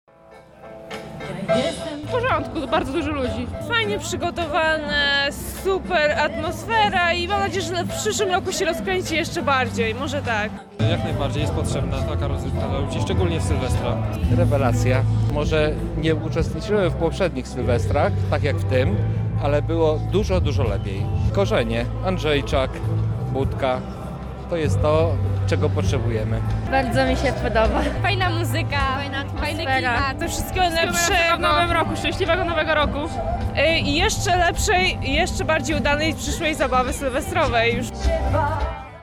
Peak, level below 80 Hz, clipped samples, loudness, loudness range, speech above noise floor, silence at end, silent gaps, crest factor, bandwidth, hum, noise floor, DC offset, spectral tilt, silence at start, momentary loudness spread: -8 dBFS; -32 dBFS; under 0.1%; -21 LUFS; 3 LU; 26 dB; 0 s; none; 12 dB; 15.5 kHz; none; -47 dBFS; under 0.1%; -5 dB/octave; 0.3 s; 7 LU